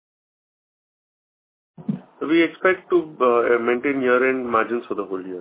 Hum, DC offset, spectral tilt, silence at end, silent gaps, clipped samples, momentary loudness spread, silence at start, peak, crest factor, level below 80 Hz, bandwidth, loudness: none; under 0.1%; -9.5 dB/octave; 0 s; none; under 0.1%; 12 LU; 1.8 s; -4 dBFS; 18 dB; -66 dBFS; 4 kHz; -21 LUFS